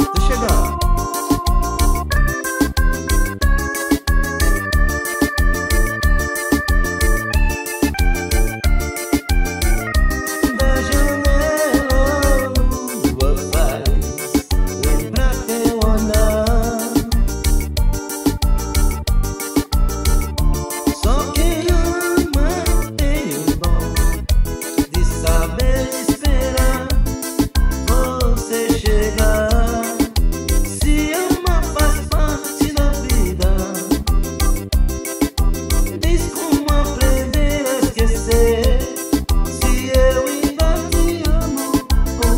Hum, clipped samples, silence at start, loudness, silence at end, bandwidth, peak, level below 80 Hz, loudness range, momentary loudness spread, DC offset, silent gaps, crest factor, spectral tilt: none; under 0.1%; 0 s; -18 LUFS; 0 s; 16.5 kHz; -2 dBFS; -18 dBFS; 2 LU; 4 LU; under 0.1%; none; 14 dB; -5 dB/octave